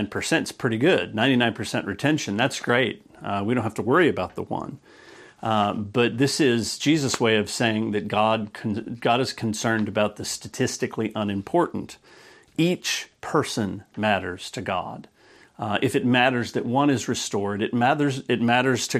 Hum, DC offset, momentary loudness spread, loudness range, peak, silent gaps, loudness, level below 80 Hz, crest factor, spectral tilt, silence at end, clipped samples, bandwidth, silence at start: none; under 0.1%; 10 LU; 4 LU; -4 dBFS; none; -24 LUFS; -62 dBFS; 20 dB; -4.5 dB/octave; 0 s; under 0.1%; 14.5 kHz; 0 s